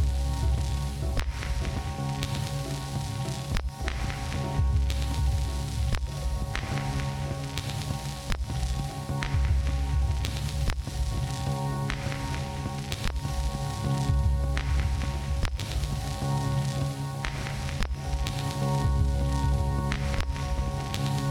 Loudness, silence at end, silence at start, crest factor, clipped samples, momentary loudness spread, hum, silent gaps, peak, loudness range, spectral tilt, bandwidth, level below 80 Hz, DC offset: -30 LUFS; 0 s; 0 s; 22 dB; under 0.1%; 5 LU; none; none; -6 dBFS; 3 LU; -5.5 dB/octave; 16 kHz; -32 dBFS; under 0.1%